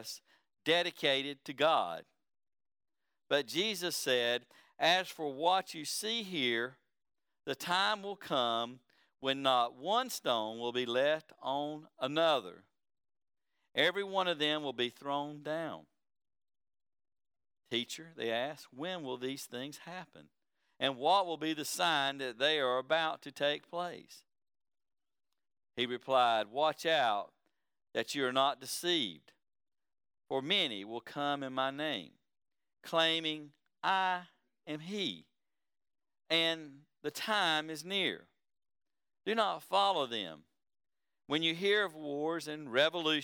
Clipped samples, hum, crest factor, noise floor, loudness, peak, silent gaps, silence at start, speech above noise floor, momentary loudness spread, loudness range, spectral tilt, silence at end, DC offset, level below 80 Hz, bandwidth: under 0.1%; none; 22 dB; -89 dBFS; -34 LUFS; -14 dBFS; none; 0 s; 55 dB; 13 LU; 6 LU; -3 dB/octave; 0 s; under 0.1%; under -90 dBFS; over 20 kHz